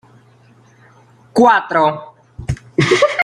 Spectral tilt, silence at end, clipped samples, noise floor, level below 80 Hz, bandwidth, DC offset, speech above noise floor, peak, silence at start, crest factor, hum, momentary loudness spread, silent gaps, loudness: -5.5 dB/octave; 0 s; under 0.1%; -48 dBFS; -42 dBFS; 13.5 kHz; under 0.1%; 36 dB; -2 dBFS; 1.35 s; 16 dB; none; 16 LU; none; -15 LUFS